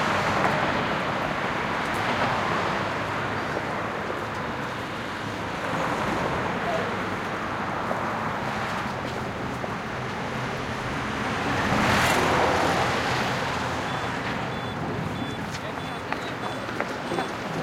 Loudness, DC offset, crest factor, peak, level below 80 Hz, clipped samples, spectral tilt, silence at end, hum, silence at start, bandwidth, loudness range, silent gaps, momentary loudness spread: -27 LUFS; under 0.1%; 20 dB; -8 dBFS; -50 dBFS; under 0.1%; -4.5 dB/octave; 0 s; none; 0 s; 16.5 kHz; 6 LU; none; 8 LU